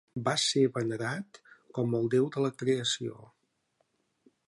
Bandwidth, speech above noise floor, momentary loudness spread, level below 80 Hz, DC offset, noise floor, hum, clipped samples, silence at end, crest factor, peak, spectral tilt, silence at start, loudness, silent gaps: 11.5 kHz; 46 dB; 13 LU; -72 dBFS; under 0.1%; -76 dBFS; none; under 0.1%; 1.25 s; 18 dB; -14 dBFS; -4.5 dB/octave; 0.15 s; -30 LUFS; none